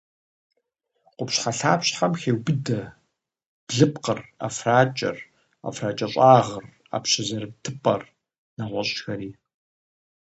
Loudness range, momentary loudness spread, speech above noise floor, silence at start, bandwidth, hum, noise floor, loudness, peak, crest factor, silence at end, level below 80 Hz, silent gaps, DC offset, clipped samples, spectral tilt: 6 LU; 16 LU; 52 dB; 1.2 s; 8.8 kHz; none; -75 dBFS; -23 LUFS; -2 dBFS; 24 dB; 0.95 s; -64 dBFS; 3.46-3.67 s, 8.38-8.57 s; under 0.1%; under 0.1%; -4.5 dB/octave